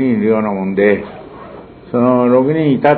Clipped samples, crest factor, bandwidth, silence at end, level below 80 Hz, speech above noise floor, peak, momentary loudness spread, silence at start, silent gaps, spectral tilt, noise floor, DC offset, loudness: under 0.1%; 14 dB; 4.5 kHz; 0 s; -50 dBFS; 22 dB; 0 dBFS; 21 LU; 0 s; none; -11 dB/octave; -34 dBFS; under 0.1%; -14 LUFS